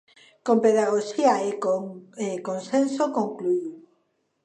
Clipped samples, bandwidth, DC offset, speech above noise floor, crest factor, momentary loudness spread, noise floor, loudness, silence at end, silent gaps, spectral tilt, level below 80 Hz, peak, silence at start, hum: under 0.1%; 9.8 kHz; under 0.1%; 48 dB; 18 dB; 12 LU; -71 dBFS; -24 LUFS; 0.65 s; none; -5.5 dB/octave; -80 dBFS; -6 dBFS; 0.45 s; none